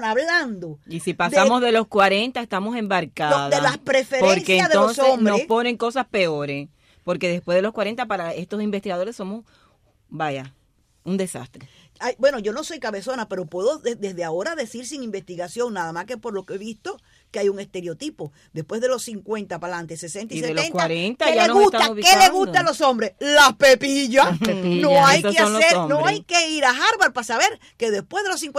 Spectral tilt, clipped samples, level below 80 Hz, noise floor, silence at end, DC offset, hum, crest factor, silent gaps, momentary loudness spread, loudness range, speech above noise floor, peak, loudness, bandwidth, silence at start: -3.5 dB/octave; under 0.1%; -58 dBFS; -60 dBFS; 0 s; under 0.1%; none; 18 dB; none; 17 LU; 13 LU; 40 dB; -2 dBFS; -19 LUFS; 15.5 kHz; 0 s